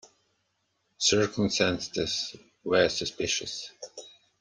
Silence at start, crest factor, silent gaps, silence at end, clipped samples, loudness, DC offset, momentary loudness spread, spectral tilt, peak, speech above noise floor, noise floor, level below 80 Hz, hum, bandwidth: 1 s; 22 dB; none; 0.3 s; under 0.1%; -27 LUFS; under 0.1%; 17 LU; -3 dB/octave; -8 dBFS; 48 dB; -76 dBFS; -60 dBFS; none; 10.5 kHz